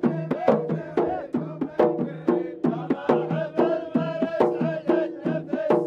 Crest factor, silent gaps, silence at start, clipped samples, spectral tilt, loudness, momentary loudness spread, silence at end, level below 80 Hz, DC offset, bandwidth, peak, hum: 20 dB; none; 0 s; under 0.1%; -9 dB/octave; -25 LUFS; 5 LU; 0 s; -66 dBFS; under 0.1%; 7 kHz; -4 dBFS; none